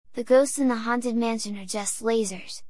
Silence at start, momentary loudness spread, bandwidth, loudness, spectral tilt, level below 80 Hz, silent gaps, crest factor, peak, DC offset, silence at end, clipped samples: 0.05 s; 10 LU; 12 kHz; -25 LUFS; -3.5 dB/octave; -68 dBFS; none; 16 dB; -8 dBFS; 0.8%; 0 s; under 0.1%